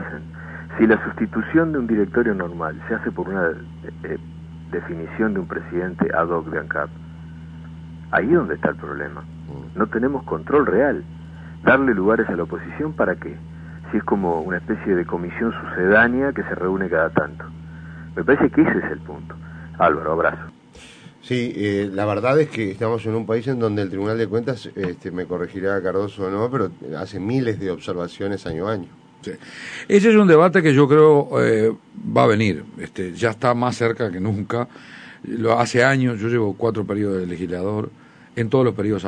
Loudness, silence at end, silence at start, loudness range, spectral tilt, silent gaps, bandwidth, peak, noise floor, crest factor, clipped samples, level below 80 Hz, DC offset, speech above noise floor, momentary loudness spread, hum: -20 LUFS; 0 s; 0 s; 9 LU; -7 dB/octave; none; 10 kHz; -2 dBFS; -45 dBFS; 20 dB; under 0.1%; -48 dBFS; under 0.1%; 25 dB; 19 LU; none